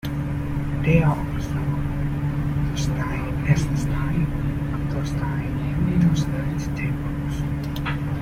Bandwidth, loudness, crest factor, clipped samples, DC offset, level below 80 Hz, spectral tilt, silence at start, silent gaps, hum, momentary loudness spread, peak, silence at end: 15 kHz; -24 LUFS; 18 dB; under 0.1%; under 0.1%; -32 dBFS; -7.5 dB/octave; 0.05 s; none; none; 7 LU; -4 dBFS; 0 s